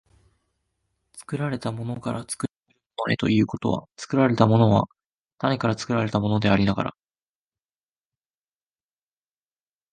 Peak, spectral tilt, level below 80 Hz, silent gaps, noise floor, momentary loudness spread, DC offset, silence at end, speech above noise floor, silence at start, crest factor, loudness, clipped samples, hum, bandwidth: -2 dBFS; -6.5 dB/octave; -52 dBFS; 2.57-2.61 s, 5.06-5.24 s; under -90 dBFS; 13 LU; under 0.1%; 3.05 s; over 68 dB; 1.15 s; 24 dB; -24 LUFS; under 0.1%; none; 11.5 kHz